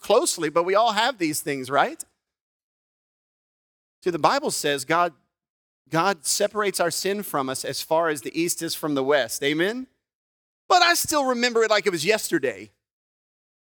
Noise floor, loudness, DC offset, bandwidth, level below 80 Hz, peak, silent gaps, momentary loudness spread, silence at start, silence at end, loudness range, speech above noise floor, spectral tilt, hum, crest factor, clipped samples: under -90 dBFS; -23 LUFS; under 0.1%; 19.5 kHz; -68 dBFS; -4 dBFS; 2.41-4.02 s, 5.50-5.85 s, 10.15-10.69 s; 8 LU; 0.05 s; 1.05 s; 5 LU; over 67 dB; -2.5 dB/octave; none; 22 dB; under 0.1%